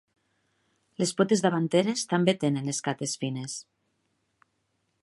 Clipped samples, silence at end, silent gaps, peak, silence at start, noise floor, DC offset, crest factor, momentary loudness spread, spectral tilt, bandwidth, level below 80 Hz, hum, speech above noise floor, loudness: under 0.1%; 1.4 s; none; -8 dBFS; 1 s; -76 dBFS; under 0.1%; 20 dB; 11 LU; -5 dB/octave; 11.5 kHz; -74 dBFS; none; 49 dB; -27 LUFS